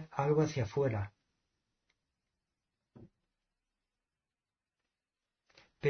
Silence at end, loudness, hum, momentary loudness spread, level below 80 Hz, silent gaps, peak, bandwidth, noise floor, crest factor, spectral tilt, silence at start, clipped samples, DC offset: 0 s; -33 LUFS; none; 10 LU; -68 dBFS; none; -18 dBFS; 6.4 kHz; under -90 dBFS; 20 dB; -7 dB/octave; 0 s; under 0.1%; under 0.1%